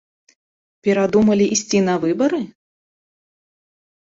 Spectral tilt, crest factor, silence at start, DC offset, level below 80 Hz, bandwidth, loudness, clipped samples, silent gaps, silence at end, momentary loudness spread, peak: -5 dB/octave; 16 dB; 0.85 s; under 0.1%; -56 dBFS; 7.8 kHz; -18 LUFS; under 0.1%; none; 1.55 s; 10 LU; -4 dBFS